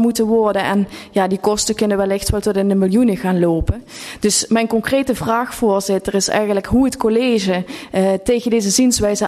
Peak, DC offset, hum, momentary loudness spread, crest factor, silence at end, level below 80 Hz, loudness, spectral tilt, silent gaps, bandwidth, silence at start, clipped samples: -4 dBFS; under 0.1%; none; 5 LU; 14 dB; 0 s; -36 dBFS; -17 LUFS; -4.5 dB/octave; none; 13.5 kHz; 0 s; under 0.1%